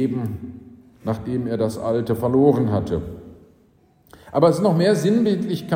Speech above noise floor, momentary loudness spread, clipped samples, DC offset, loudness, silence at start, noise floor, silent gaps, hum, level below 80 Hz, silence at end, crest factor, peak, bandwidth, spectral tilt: 37 dB; 15 LU; under 0.1%; under 0.1%; -20 LUFS; 0 s; -57 dBFS; none; none; -48 dBFS; 0 s; 18 dB; -4 dBFS; 16 kHz; -7.5 dB/octave